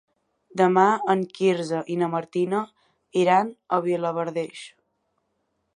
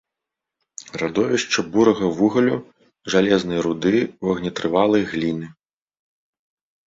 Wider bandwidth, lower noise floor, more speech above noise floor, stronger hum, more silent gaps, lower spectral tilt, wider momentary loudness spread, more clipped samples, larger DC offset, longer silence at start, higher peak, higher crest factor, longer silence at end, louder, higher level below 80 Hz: first, 11 kHz vs 7.8 kHz; second, -74 dBFS vs -85 dBFS; second, 51 dB vs 65 dB; neither; neither; first, -6.5 dB/octave vs -5 dB/octave; about the same, 11 LU vs 13 LU; neither; neither; second, 0.55 s vs 0.8 s; about the same, -4 dBFS vs -2 dBFS; about the same, 20 dB vs 20 dB; second, 1.05 s vs 1.35 s; second, -23 LUFS vs -20 LUFS; second, -76 dBFS vs -54 dBFS